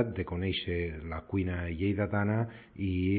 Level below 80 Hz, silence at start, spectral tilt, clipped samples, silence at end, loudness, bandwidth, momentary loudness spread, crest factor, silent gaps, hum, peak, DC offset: -44 dBFS; 0 s; -11 dB/octave; under 0.1%; 0 s; -33 LUFS; 4.7 kHz; 7 LU; 16 dB; none; none; -14 dBFS; under 0.1%